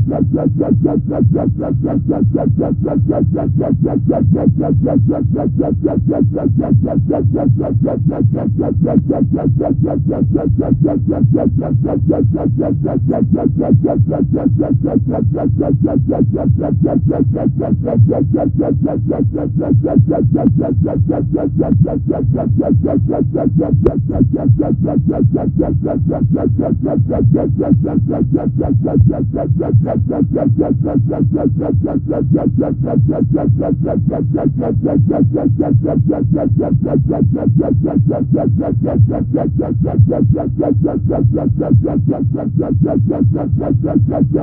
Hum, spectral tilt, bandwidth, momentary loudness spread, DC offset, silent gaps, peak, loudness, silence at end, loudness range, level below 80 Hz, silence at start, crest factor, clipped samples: none; -15 dB/octave; 2.5 kHz; 3 LU; under 0.1%; none; 0 dBFS; -14 LUFS; 0 s; 1 LU; -32 dBFS; 0 s; 12 dB; under 0.1%